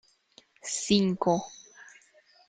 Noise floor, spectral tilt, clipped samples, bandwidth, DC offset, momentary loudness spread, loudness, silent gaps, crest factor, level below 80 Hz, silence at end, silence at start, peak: -61 dBFS; -4.5 dB/octave; under 0.1%; 9.6 kHz; under 0.1%; 23 LU; -27 LUFS; none; 22 dB; -64 dBFS; 0.6 s; 0.65 s; -8 dBFS